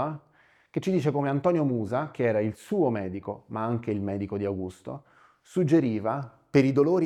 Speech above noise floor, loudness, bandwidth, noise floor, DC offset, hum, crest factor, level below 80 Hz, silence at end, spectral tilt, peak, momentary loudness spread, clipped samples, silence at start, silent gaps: 36 dB; -27 LUFS; 12.5 kHz; -62 dBFS; under 0.1%; none; 20 dB; -66 dBFS; 0 s; -8.5 dB/octave; -8 dBFS; 13 LU; under 0.1%; 0 s; none